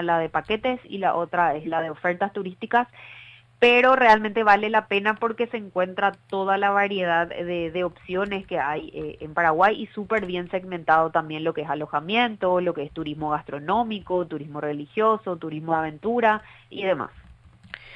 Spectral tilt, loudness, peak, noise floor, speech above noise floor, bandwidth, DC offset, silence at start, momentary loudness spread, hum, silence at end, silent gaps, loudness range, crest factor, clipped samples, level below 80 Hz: -6.5 dB/octave; -23 LUFS; -4 dBFS; -50 dBFS; 27 dB; 9.4 kHz; under 0.1%; 0 s; 12 LU; none; 0 s; none; 6 LU; 20 dB; under 0.1%; -56 dBFS